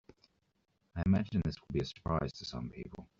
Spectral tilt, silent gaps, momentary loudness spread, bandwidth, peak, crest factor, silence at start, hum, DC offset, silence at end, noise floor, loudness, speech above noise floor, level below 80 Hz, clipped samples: -7 dB/octave; none; 13 LU; 7.4 kHz; -18 dBFS; 18 dB; 0.95 s; none; under 0.1%; 0.15 s; -78 dBFS; -36 LUFS; 43 dB; -54 dBFS; under 0.1%